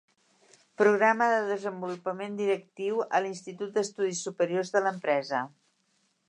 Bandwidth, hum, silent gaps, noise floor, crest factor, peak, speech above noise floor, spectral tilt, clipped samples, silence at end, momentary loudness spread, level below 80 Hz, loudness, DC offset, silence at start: 10 kHz; none; none; -72 dBFS; 20 dB; -10 dBFS; 44 dB; -4.5 dB/octave; under 0.1%; 0.8 s; 11 LU; -84 dBFS; -28 LUFS; under 0.1%; 0.8 s